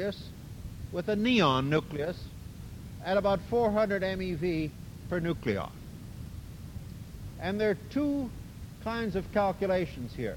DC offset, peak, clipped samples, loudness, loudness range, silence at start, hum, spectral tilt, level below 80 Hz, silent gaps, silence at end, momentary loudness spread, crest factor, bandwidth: under 0.1%; -10 dBFS; under 0.1%; -30 LUFS; 6 LU; 0 s; none; -6.5 dB/octave; -48 dBFS; none; 0 s; 18 LU; 20 dB; 17 kHz